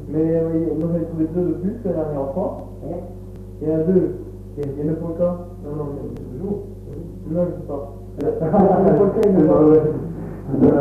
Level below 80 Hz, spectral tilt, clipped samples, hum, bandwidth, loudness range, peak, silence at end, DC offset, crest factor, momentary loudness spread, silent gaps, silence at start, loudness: -40 dBFS; -11 dB/octave; under 0.1%; 50 Hz at -40 dBFS; 6.4 kHz; 9 LU; -4 dBFS; 0 s; under 0.1%; 16 dB; 18 LU; none; 0 s; -20 LUFS